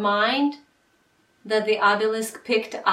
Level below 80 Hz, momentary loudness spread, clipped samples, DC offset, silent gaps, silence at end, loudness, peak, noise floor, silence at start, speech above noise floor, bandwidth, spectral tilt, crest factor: -74 dBFS; 7 LU; under 0.1%; under 0.1%; none; 0 s; -22 LUFS; -4 dBFS; -64 dBFS; 0 s; 42 dB; 16 kHz; -3.5 dB/octave; 18 dB